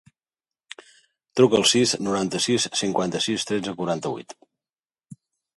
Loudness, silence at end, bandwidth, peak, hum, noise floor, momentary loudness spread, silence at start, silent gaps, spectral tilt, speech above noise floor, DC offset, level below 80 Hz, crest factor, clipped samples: -22 LUFS; 0.45 s; 11.5 kHz; -4 dBFS; none; under -90 dBFS; 22 LU; 1.35 s; none; -3.5 dB/octave; over 68 dB; under 0.1%; -62 dBFS; 22 dB; under 0.1%